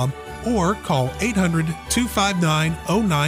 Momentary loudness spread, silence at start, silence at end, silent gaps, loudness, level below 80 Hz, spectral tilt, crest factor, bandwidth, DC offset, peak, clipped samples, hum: 5 LU; 0 s; 0 s; none; -21 LUFS; -38 dBFS; -5 dB/octave; 14 dB; 15.5 kHz; under 0.1%; -6 dBFS; under 0.1%; none